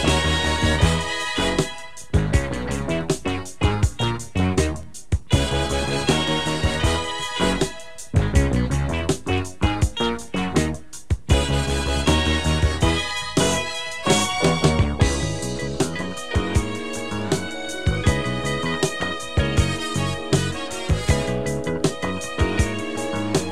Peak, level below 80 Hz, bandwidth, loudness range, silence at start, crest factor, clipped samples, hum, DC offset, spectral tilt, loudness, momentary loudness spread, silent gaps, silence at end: -4 dBFS; -30 dBFS; 14.5 kHz; 3 LU; 0 s; 18 dB; under 0.1%; none; 1%; -4.5 dB/octave; -22 LUFS; 7 LU; none; 0 s